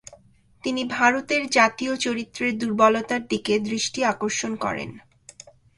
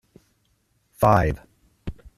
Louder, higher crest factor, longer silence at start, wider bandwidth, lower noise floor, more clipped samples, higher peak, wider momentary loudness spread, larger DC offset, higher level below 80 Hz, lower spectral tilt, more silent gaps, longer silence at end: about the same, -23 LUFS vs -21 LUFS; about the same, 20 dB vs 22 dB; second, 0.1 s vs 1 s; second, 11.5 kHz vs 14 kHz; second, -55 dBFS vs -67 dBFS; neither; about the same, -4 dBFS vs -4 dBFS; second, 9 LU vs 21 LU; neither; second, -60 dBFS vs -40 dBFS; second, -3 dB/octave vs -7.5 dB/octave; neither; first, 0.8 s vs 0.25 s